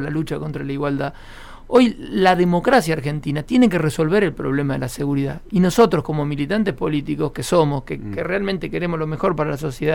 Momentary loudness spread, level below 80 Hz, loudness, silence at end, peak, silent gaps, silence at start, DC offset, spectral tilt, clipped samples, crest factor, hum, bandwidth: 9 LU; -40 dBFS; -20 LUFS; 0 s; -4 dBFS; none; 0 s; under 0.1%; -6.5 dB/octave; under 0.1%; 16 dB; none; 16.5 kHz